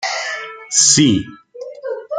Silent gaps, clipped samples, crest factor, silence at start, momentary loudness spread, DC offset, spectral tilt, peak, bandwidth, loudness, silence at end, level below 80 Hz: none; under 0.1%; 18 dB; 0 s; 24 LU; under 0.1%; -2.5 dB/octave; 0 dBFS; 10 kHz; -13 LUFS; 0 s; -54 dBFS